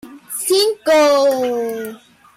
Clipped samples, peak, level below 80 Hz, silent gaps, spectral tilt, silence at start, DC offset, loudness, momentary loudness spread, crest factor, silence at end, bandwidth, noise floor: under 0.1%; -6 dBFS; -62 dBFS; none; -1.5 dB/octave; 0.05 s; under 0.1%; -15 LUFS; 15 LU; 12 dB; 0.4 s; 16.5 kHz; -36 dBFS